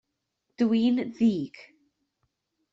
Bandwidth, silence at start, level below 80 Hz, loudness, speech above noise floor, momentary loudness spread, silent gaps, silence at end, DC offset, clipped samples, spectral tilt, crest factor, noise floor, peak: 7.4 kHz; 0.6 s; -68 dBFS; -26 LUFS; 55 dB; 10 LU; none; 1.1 s; under 0.1%; under 0.1%; -7.5 dB/octave; 16 dB; -80 dBFS; -14 dBFS